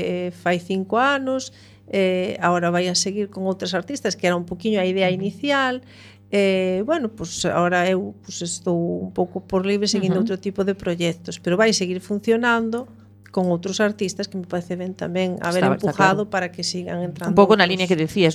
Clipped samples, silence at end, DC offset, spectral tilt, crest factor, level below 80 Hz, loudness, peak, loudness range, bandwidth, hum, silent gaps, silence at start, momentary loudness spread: under 0.1%; 0 s; under 0.1%; -4.5 dB/octave; 20 dB; -56 dBFS; -21 LUFS; 0 dBFS; 2 LU; 13 kHz; none; none; 0 s; 9 LU